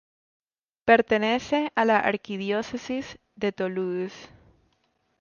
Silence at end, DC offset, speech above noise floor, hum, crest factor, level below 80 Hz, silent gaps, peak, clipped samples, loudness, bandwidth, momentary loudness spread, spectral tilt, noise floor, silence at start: 0.95 s; under 0.1%; 46 dB; none; 22 dB; -62 dBFS; none; -6 dBFS; under 0.1%; -25 LUFS; 7.2 kHz; 12 LU; -5.5 dB/octave; -71 dBFS; 0.85 s